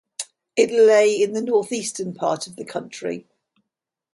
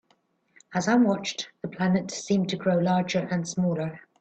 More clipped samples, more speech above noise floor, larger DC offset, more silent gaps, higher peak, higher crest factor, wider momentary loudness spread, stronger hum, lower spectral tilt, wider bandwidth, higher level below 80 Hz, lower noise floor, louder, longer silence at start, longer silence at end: neither; first, 64 dB vs 43 dB; neither; neither; first, -4 dBFS vs -10 dBFS; about the same, 18 dB vs 16 dB; first, 17 LU vs 10 LU; neither; second, -3.5 dB/octave vs -5.5 dB/octave; first, 11.5 kHz vs 8.6 kHz; second, -72 dBFS vs -66 dBFS; first, -84 dBFS vs -68 dBFS; first, -21 LUFS vs -26 LUFS; second, 0.2 s vs 0.7 s; first, 0.95 s vs 0.2 s